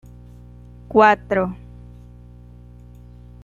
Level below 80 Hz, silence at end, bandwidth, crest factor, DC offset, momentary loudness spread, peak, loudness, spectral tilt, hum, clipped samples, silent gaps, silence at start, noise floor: -44 dBFS; 1.9 s; 7.6 kHz; 22 dB; under 0.1%; 24 LU; -2 dBFS; -17 LUFS; -7 dB/octave; 60 Hz at -40 dBFS; under 0.1%; none; 0.9 s; -42 dBFS